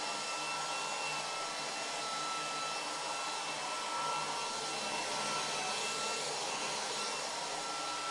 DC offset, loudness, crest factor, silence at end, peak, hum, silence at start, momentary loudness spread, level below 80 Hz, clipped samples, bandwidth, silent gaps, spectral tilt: under 0.1%; -36 LUFS; 14 dB; 0 s; -24 dBFS; none; 0 s; 3 LU; -76 dBFS; under 0.1%; 11.5 kHz; none; -0.5 dB/octave